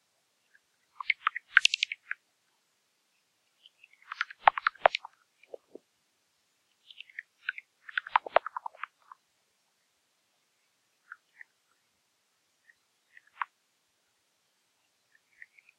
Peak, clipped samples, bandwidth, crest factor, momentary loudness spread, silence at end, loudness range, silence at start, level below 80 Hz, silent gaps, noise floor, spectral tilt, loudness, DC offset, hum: -4 dBFS; under 0.1%; 12.5 kHz; 32 dB; 25 LU; 2.35 s; 18 LU; 1.1 s; -74 dBFS; none; -75 dBFS; 1 dB/octave; -30 LUFS; under 0.1%; none